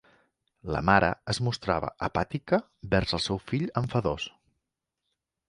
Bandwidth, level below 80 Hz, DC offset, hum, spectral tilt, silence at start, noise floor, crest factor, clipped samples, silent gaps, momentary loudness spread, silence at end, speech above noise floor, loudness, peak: 11.5 kHz; -48 dBFS; under 0.1%; none; -5.5 dB/octave; 0.65 s; -84 dBFS; 24 dB; under 0.1%; none; 9 LU; 1.2 s; 57 dB; -28 LUFS; -4 dBFS